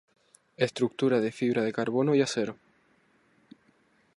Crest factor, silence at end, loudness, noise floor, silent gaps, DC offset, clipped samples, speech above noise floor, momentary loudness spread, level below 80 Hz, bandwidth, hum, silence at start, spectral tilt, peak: 20 dB; 1.65 s; -28 LUFS; -66 dBFS; none; under 0.1%; under 0.1%; 39 dB; 6 LU; -74 dBFS; 11.5 kHz; none; 0.6 s; -5.5 dB/octave; -10 dBFS